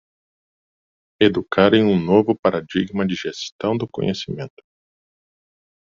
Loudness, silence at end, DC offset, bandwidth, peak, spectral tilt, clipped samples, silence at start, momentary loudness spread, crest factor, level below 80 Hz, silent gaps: -19 LUFS; 1.35 s; under 0.1%; 7.4 kHz; -2 dBFS; -5 dB/octave; under 0.1%; 1.2 s; 13 LU; 20 dB; -58 dBFS; 2.39-2.43 s, 3.52-3.59 s